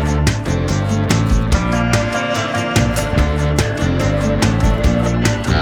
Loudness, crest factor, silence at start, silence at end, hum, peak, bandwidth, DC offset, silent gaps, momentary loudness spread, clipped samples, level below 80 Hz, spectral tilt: -16 LUFS; 16 dB; 0 s; 0 s; none; 0 dBFS; 17 kHz; under 0.1%; none; 2 LU; under 0.1%; -22 dBFS; -5.5 dB/octave